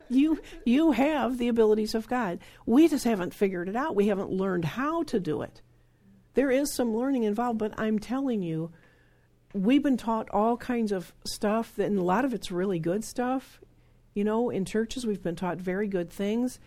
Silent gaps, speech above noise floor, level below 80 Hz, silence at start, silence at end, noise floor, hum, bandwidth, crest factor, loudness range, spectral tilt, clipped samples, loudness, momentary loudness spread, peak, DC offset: none; 35 dB; -54 dBFS; 0.1 s; 0.1 s; -62 dBFS; none; 16 kHz; 16 dB; 5 LU; -6 dB/octave; under 0.1%; -28 LUFS; 8 LU; -12 dBFS; under 0.1%